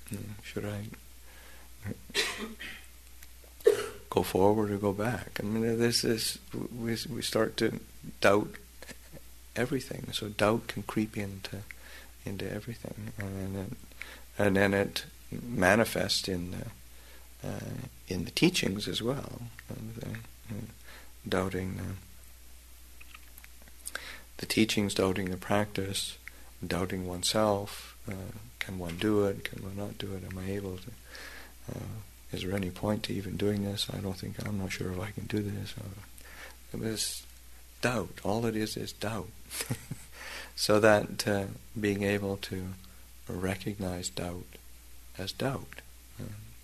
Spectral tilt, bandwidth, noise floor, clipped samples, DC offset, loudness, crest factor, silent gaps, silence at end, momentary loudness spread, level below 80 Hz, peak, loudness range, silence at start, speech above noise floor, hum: -4.5 dB/octave; 13.5 kHz; -52 dBFS; under 0.1%; 0.2%; -32 LUFS; 26 dB; none; 0 s; 21 LU; -54 dBFS; -6 dBFS; 8 LU; 0 s; 20 dB; none